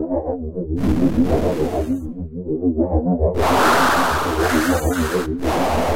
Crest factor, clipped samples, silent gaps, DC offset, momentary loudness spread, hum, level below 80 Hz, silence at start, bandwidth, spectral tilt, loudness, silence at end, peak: 14 dB; under 0.1%; none; under 0.1%; 10 LU; none; -30 dBFS; 0 s; 16 kHz; -5.5 dB/octave; -19 LUFS; 0 s; -6 dBFS